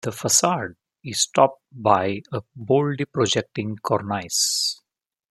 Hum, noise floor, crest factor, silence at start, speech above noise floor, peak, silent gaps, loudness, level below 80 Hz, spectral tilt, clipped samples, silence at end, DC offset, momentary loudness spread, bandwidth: none; -81 dBFS; 22 dB; 0.05 s; 59 dB; -2 dBFS; none; -22 LUFS; -66 dBFS; -3 dB/octave; under 0.1%; 0.55 s; under 0.1%; 13 LU; 15 kHz